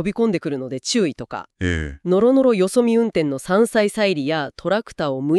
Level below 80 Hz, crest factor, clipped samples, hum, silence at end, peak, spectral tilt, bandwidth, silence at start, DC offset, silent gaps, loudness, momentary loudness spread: -42 dBFS; 16 dB; under 0.1%; none; 0 s; -4 dBFS; -5.5 dB/octave; 13 kHz; 0 s; under 0.1%; none; -20 LUFS; 9 LU